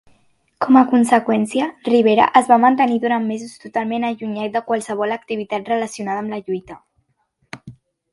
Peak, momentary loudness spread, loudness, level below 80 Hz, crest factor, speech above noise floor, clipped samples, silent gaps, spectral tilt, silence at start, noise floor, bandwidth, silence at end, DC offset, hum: 0 dBFS; 14 LU; -18 LUFS; -62 dBFS; 18 dB; 49 dB; under 0.1%; none; -5 dB/octave; 0.6 s; -67 dBFS; 11.5 kHz; 0.4 s; under 0.1%; none